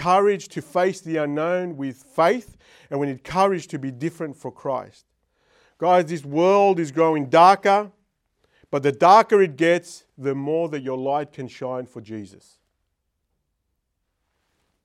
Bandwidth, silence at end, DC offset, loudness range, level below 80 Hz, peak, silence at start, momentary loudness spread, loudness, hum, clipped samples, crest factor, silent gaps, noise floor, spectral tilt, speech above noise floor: 13 kHz; 2.6 s; under 0.1%; 12 LU; -66 dBFS; -2 dBFS; 0 s; 18 LU; -21 LUFS; none; under 0.1%; 20 dB; none; -76 dBFS; -6 dB/octave; 55 dB